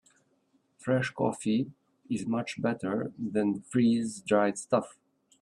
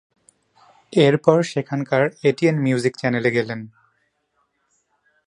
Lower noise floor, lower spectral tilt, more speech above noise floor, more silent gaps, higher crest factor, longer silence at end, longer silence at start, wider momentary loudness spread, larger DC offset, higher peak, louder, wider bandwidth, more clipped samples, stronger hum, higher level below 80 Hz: about the same, -71 dBFS vs -69 dBFS; about the same, -6 dB/octave vs -6.5 dB/octave; second, 42 dB vs 51 dB; neither; about the same, 20 dB vs 20 dB; second, 0.5 s vs 1.6 s; about the same, 0.8 s vs 0.9 s; about the same, 8 LU vs 9 LU; neither; second, -10 dBFS vs 0 dBFS; second, -30 LUFS vs -19 LUFS; about the same, 11.5 kHz vs 11 kHz; neither; neither; second, -70 dBFS vs -64 dBFS